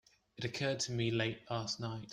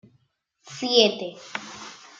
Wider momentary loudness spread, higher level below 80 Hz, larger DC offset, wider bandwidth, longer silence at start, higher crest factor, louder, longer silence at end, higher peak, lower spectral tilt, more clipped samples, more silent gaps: second, 7 LU vs 21 LU; first, -68 dBFS vs -74 dBFS; neither; first, 10.5 kHz vs 7.8 kHz; second, 0.4 s vs 0.65 s; second, 18 dB vs 26 dB; second, -37 LUFS vs -22 LUFS; second, 0 s vs 0.25 s; second, -20 dBFS vs -2 dBFS; first, -4.5 dB/octave vs -2.5 dB/octave; neither; neither